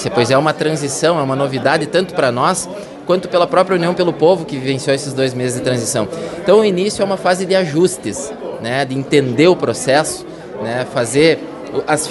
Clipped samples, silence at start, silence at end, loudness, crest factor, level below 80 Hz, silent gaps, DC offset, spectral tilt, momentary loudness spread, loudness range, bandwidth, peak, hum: under 0.1%; 0 s; 0 s; -16 LUFS; 16 dB; -52 dBFS; none; under 0.1%; -4.5 dB/octave; 10 LU; 1 LU; 12 kHz; 0 dBFS; none